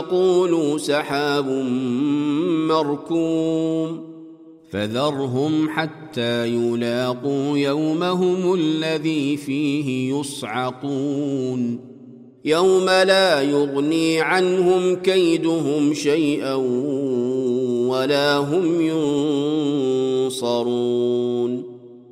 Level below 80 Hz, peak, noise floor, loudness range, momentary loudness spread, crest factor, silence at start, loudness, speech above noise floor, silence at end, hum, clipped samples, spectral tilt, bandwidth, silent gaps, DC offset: -68 dBFS; -4 dBFS; -43 dBFS; 5 LU; 8 LU; 16 dB; 0 s; -20 LUFS; 23 dB; 0.1 s; none; under 0.1%; -5.5 dB/octave; 15 kHz; none; under 0.1%